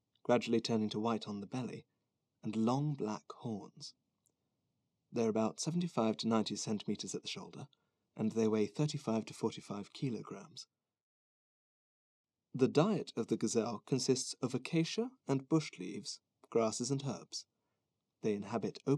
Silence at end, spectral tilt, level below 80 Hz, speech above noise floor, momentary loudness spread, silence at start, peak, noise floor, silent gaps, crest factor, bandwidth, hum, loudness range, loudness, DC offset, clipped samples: 0 s; -5.5 dB/octave; -90 dBFS; 51 dB; 14 LU; 0.3 s; -14 dBFS; -87 dBFS; 11.02-12.24 s; 22 dB; 12 kHz; none; 6 LU; -37 LUFS; under 0.1%; under 0.1%